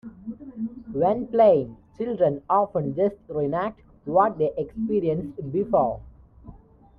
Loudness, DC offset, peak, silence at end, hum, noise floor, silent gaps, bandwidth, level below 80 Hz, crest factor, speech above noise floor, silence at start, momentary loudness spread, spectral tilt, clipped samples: -24 LUFS; under 0.1%; -6 dBFS; 0.45 s; none; -48 dBFS; none; 5.2 kHz; -52 dBFS; 18 dB; 25 dB; 0.05 s; 15 LU; -10.5 dB/octave; under 0.1%